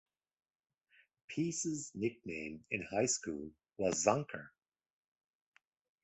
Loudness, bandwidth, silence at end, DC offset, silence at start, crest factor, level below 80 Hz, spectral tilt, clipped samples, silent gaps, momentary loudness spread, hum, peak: -37 LUFS; 8.4 kHz; 1.55 s; under 0.1%; 1.3 s; 26 dB; -70 dBFS; -4 dB/octave; under 0.1%; none; 13 LU; none; -14 dBFS